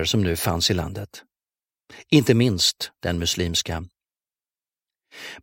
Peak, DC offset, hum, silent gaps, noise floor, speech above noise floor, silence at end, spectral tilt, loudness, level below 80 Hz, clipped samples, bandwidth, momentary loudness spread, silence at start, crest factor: -4 dBFS; under 0.1%; none; none; under -90 dBFS; over 67 dB; 0.05 s; -4.5 dB/octave; -21 LUFS; -44 dBFS; under 0.1%; 16.5 kHz; 18 LU; 0 s; 22 dB